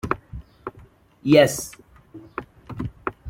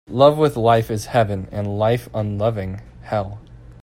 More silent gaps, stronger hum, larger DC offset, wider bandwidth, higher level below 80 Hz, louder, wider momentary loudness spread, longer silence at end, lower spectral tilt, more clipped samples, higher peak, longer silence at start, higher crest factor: neither; neither; neither; about the same, 16.5 kHz vs 16 kHz; about the same, -48 dBFS vs -44 dBFS; about the same, -21 LUFS vs -20 LUFS; first, 23 LU vs 15 LU; about the same, 0 s vs 0.1 s; second, -5 dB/octave vs -7 dB/octave; neither; about the same, -2 dBFS vs 0 dBFS; about the same, 0.05 s vs 0.1 s; about the same, 22 dB vs 20 dB